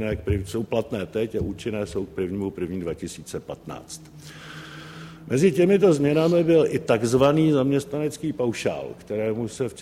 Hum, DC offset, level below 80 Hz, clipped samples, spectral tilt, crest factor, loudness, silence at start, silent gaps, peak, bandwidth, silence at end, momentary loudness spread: none; under 0.1%; -48 dBFS; under 0.1%; -6.5 dB/octave; 18 dB; -23 LUFS; 0 s; none; -6 dBFS; 15.5 kHz; 0 s; 21 LU